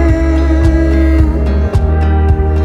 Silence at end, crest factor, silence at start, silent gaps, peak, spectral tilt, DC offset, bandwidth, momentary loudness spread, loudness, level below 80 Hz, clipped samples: 0 s; 10 dB; 0 s; none; 0 dBFS; -9 dB/octave; under 0.1%; 7 kHz; 2 LU; -12 LUFS; -12 dBFS; under 0.1%